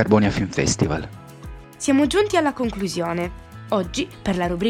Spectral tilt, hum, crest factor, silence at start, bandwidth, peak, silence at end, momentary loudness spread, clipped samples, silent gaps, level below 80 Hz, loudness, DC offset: -5 dB/octave; none; 20 dB; 0 s; 16 kHz; 0 dBFS; 0 s; 21 LU; under 0.1%; none; -40 dBFS; -22 LUFS; under 0.1%